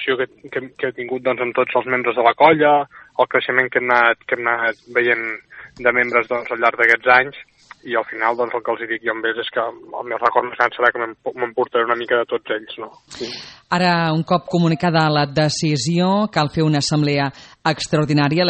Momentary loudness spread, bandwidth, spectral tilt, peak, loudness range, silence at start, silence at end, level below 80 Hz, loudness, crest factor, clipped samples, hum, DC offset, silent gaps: 12 LU; 8.8 kHz; -5.5 dB/octave; 0 dBFS; 5 LU; 0 s; 0 s; -56 dBFS; -18 LUFS; 18 dB; under 0.1%; none; under 0.1%; none